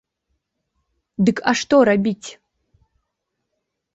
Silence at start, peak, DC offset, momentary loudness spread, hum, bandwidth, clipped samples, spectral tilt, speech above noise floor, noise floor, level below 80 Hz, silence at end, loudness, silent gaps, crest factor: 1.2 s; -2 dBFS; under 0.1%; 19 LU; none; 8.2 kHz; under 0.1%; -5.5 dB/octave; 60 dB; -77 dBFS; -58 dBFS; 1.65 s; -18 LUFS; none; 20 dB